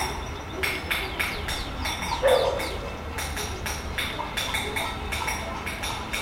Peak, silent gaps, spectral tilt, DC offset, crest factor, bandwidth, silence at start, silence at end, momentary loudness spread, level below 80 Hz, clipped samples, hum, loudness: -8 dBFS; none; -3 dB/octave; under 0.1%; 20 dB; 16.5 kHz; 0 s; 0 s; 8 LU; -38 dBFS; under 0.1%; none; -28 LUFS